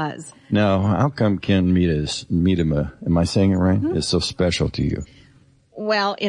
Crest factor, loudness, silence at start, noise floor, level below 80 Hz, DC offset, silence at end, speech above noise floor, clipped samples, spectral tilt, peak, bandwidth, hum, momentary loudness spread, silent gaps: 12 dB; -20 LUFS; 0 s; -53 dBFS; -42 dBFS; under 0.1%; 0 s; 34 dB; under 0.1%; -6 dB/octave; -8 dBFS; 11 kHz; none; 7 LU; none